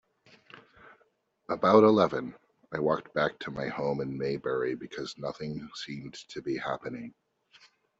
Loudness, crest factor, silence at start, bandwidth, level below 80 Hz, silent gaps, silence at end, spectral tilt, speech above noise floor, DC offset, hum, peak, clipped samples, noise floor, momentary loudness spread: -29 LUFS; 22 dB; 0.55 s; 8 kHz; -66 dBFS; none; 0.9 s; -5 dB/octave; 41 dB; under 0.1%; none; -8 dBFS; under 0.1%; -70 dBFS; 18 LU